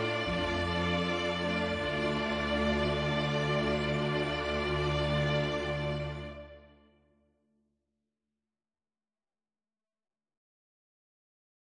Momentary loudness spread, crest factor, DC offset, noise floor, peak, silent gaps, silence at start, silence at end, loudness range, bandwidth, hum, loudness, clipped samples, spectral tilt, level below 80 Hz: 4 LU; 16 dB; under 0.1%; under -90 dBFS; -18 dBFS; none; 0 s; 5.1 s; 10 LU; 10 kHz; none; -31 LUFS; under 0.1%; -6 dB/octave; -48 dBFS